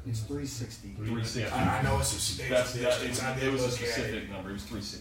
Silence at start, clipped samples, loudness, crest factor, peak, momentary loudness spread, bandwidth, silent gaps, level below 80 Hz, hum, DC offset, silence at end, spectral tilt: 0 s; under 0.1%; -31 LUFS; 18 dB; -14 dBFS; 11 LU; 16 kHz; none; -46 dBFS; none; under 0.1%; 0 s; -4 dB/octave